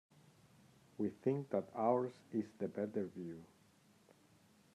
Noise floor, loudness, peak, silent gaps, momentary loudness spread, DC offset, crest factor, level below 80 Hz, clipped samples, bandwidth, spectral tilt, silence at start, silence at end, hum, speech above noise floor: -69 dBFS; -41 LUFS; -20 dBFS; none; 14 LU; under 0.1%; 22 dB; -86 dBFS; under 0.1%; 13 kHz; -8.5 dB/octave; 1 s; 1.3 s; none; 30 dB